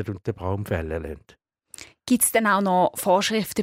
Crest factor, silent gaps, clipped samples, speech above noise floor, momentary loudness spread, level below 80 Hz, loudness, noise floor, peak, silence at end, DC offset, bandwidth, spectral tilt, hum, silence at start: 16 dB; none; under 0.1%; 23 dB; 20 LU; -46 dBFS; -22 LUFS; -46 dBFS; -6 dBFS; 0 s; under 0.1%; 16 kHz; -4 dB/octave; none; 0 s